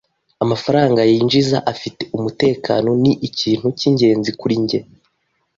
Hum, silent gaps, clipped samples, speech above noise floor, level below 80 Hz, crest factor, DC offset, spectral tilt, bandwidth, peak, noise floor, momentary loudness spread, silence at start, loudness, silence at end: none; none; under 0.1%; 51 dB; -54 dBFS; 14 dB; under 0.1%; -6.5 dB/octave; 7.6 kHz; -2 dBFS; -67 dBFS; 10 LU; 0.4 s; -17 LUFS; 0.75 s